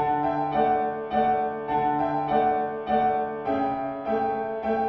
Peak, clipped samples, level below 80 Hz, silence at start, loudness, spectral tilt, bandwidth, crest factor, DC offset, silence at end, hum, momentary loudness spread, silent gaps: -10 dBFS; under 0.1%; -54 dBFS; 0 s; -25 LUFS; -8.5 dB/octave; 5.8 kHz; 14 dB; under 0.1%; 0 s; none; 4 LU; none